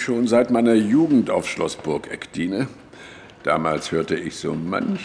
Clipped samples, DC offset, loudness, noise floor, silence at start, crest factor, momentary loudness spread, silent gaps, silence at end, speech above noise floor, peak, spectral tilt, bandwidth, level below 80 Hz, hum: under 0.1%; under 0.1%; -21 LUFS; -42 dBFS; 0 s; 16 dB; 14 LU; none; 0 s; 22 dB; -6 dBFS; -6 dB/octave; 11 kHz; -56 dBFS; none